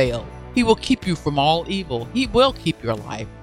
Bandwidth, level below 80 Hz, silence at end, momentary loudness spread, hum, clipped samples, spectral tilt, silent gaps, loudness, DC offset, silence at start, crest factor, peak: 13 kHz; -38 dBFS; 0 s; 9 LU; none; under 0.1%; -5.5 dB/octave; none; -21 LUFS; under 0.1%; 0 s; 20 dB; -2 dBFS